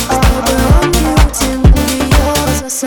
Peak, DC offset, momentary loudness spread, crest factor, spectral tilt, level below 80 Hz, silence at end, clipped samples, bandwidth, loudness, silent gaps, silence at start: 0 dBFS; under 0.1%; 3 LU; 10 dB; -4.5 dB/octave; -14 dBFS; 0 s; 0.6%; over 20 kHz; -11 LUFS; none; 0 s